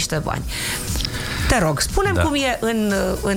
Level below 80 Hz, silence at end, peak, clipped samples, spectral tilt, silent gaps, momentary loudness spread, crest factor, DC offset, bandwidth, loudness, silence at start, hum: -30 dBFS; 0 s; -4 dBFS; under 0.1%; -4 dB/octave; none; 6 LU; 16 dB; under 0.1%; 19 kHz; -20 LUFS; 0 s; none